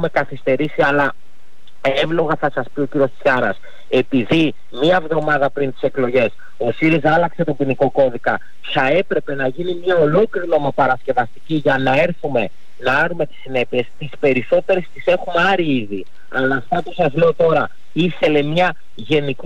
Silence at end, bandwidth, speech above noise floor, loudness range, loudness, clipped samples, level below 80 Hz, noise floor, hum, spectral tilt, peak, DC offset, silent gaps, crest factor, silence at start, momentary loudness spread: 0.1 s; 9.2 kHz; 36 dB; 1 LU; -18 LUFS; under 0.1%; -52 dBFS; -53 dBFS; none; -7 dB/octave; -6 dBFS; 6%; none; 12 dB; 0 s; 7 LU